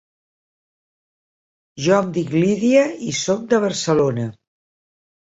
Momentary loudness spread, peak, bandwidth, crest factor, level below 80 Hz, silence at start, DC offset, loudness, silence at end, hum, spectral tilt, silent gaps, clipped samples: 8 LU; -2 dBFS; 8 kHz; 18 dB; -60 dBFS; 1.75 s; under 0.1%; -19 LUFS; 1.05 s; none; -5 dB/octave; none; under 0.1%